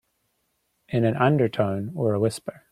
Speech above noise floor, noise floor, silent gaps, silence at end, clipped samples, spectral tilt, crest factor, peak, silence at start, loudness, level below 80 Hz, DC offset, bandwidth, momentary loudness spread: 50 dB; -73 dBFS; none; 0.2 s; under 0.1%; -7 dB/octave; 20 dB; -6 dBFS; 0.9 s; -24 LUFS; -60 dBFS; under 0.1%; 13 kHz; 7 LU